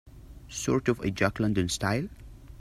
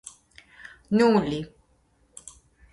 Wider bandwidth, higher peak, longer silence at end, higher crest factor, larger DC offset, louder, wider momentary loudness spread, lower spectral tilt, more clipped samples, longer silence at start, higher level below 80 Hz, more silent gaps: first, 14.5 kHz vs 11.5 kHz; about the same, -8 dBFS vs -6 dBFS; second, 0 s vs 1.25 s; about the same, 20 dB vs 20 dB; neither; second, -28 LUFS vs -23 LUFS; second, 8 LU vs 26 LU; about the same, -5 dB/octave vs -6 dB/octave; neither; second, 0.05 s vs 0.9 s; first, -48 dBFS vs -58 dBFS; neither